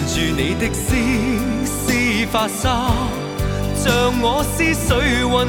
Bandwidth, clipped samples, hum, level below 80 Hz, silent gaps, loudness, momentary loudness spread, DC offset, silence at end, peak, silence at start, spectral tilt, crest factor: 19.5 kHz; under 0.1%; none; -28 dBFS; none; -18 LUFS; 5 LU; under 0.1%; 0 s; -2 dBFS; 0 s; -4.5 dB/octave; 16 dB